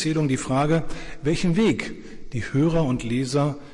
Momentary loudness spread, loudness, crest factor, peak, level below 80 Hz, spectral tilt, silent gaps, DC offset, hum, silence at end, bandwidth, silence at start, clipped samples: 13 LU; -23 LUFS; 12 dB; -12 dBFS; -40 dBFS; -6.5 dB/octave; none; under 0.1%; none; 0 s; 11.5 kHz; 0 s; under 0.1%